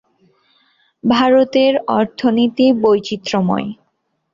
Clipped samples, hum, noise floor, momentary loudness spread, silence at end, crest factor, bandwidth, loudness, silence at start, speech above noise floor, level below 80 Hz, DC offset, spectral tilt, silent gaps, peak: under 0.1%; none; -68 dBFS; 8 LU; 0.6 s; 14 dB; 7.4 kHz; -15 LUFS; 1.05 s; 54 dB; -58 dBFS; under 0.1%; -6 dB/octave; none; -2 dBFS